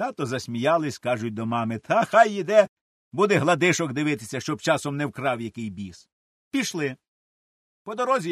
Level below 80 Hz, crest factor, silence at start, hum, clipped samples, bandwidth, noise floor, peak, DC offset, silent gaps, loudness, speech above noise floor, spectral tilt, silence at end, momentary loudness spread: -68 dBFS; 20 dB; 0 s; none; under 0.1%; 13 kHz; under -90 dBFS; -4 dBFS; under 0.1%; 2.69-3.11 s, 6.12-6.51 s, 7.08-7.85 s; -24 LUFS; over 66 dB; -5 dB/octave; 0 s; 14 LU